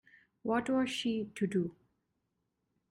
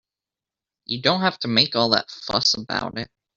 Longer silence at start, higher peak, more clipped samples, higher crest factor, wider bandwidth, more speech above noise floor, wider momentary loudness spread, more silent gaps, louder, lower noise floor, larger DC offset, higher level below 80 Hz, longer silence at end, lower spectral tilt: second, 0.45 s vs 0.9 s; second, -20 dBFS vs -2 dBFS; neither; second, 16 dB vs 22 dB; first, 13 kHz vs 7.6 kHz; second, 50 dB vs 67 dB; second, 7 LU vs 11 LU; neither; second, -34 LUFS vs -21 LUFS; second, -83 dBFS vs -89 dBFS; neither; second, -72 dBFS vs -58 dBFS; first, 1.2 s vs 0.3 s; first, -5.5 dB/octave vs -2 dB/octave